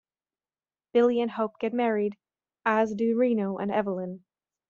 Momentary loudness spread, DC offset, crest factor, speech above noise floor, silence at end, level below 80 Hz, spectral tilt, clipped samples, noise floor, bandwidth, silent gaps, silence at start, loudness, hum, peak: 9 LU; under 0.1%; 18 dB; over 64 dB; 0.5 s; -74 dBFS; -5.5 dB/octave; under 0.1%; under -90 dBFS; 7 kHz; none; 0.95 s; -27 LUFS; none; -10 dBFS